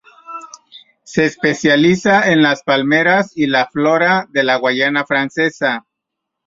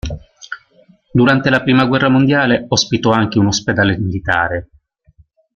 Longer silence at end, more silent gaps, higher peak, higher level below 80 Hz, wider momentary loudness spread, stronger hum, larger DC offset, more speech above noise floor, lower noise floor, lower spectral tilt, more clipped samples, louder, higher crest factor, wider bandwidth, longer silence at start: second, 0.7 s vs 0.9 s; neither; about the same, -2 dBFS vs -2 dBFS; second, -56 dBFS vs -40 dBFS; second, 10 LU vs 18 LU; neither; neither; first, 64 dB vs 38 dB; first, -78 dBFS vs -51 dBFS; about the same, -5 dB/octave vs -5 dB/octave; neither; about the same, -14 LUFS vs -14 LUFS; about the same, 14 dB vs 14 dB; about the same, 7.8 kHz vs 7.4 kHz; first, 0.3 s vs 0.05 s